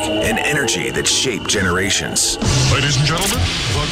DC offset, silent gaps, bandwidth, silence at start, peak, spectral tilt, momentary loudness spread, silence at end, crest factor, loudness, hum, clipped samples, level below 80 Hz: under 0.1%; none; 16 kHz; 0 s; -4 dBFS; -3 dB/octave; 3 LU; 0 s; 14 dB; -16 LUFS; none; under 0.1%; -32 dBFS